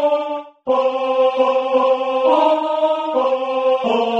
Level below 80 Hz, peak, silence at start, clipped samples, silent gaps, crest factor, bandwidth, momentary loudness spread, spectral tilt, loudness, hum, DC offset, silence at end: -70 dBFS; -2 dBFS; 0 s; under 0.1%; none; 14 dB; 7.2 kHz; 4 LU; -4.5 dB/octave; -17 LUFS; none; under 0.1%; 0 s